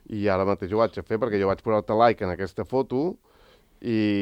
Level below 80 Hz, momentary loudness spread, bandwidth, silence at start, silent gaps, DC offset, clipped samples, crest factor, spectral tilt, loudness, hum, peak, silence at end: -56 dBFS; 9 LU; 9.6 kHz; 0.1 s; none; under 0.1%; under 0.1%; 20 dB; -8 dB/octave; -25 LUFS; none; -4 dBFS; 0 s